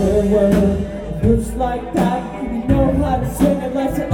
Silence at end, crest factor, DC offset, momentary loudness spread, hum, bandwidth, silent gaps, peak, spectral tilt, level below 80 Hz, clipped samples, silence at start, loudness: 0 s; 14 dB; under 0.1%; 9 LU; none; 17.5 kHz; none; -2 dBFS; -7.5 dB/octave; -28 dBFS; under 0.1%; 0 s; -18 LUFS